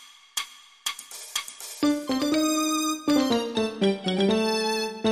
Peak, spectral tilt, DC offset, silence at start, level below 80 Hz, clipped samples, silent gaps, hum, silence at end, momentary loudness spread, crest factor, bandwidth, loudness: -10 dBFS; -3.5 dB/octave; under 0.1%; 0 s; -62 dBFS; under 0.1%; none; none; 0 s; 9 LU; 16 dB; 15.5 kHz; -26 LUFS